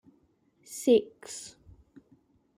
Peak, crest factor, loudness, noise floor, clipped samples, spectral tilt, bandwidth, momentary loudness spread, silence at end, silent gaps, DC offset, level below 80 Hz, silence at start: -12 dBFS; 22 dB; -27 LUFS; -68 dBFS; under 0.1%; -4 dB/octave; 16 kHz; 19 LU; 1.15 s; none; under 0.1%; -68 dBFS; 0.7 s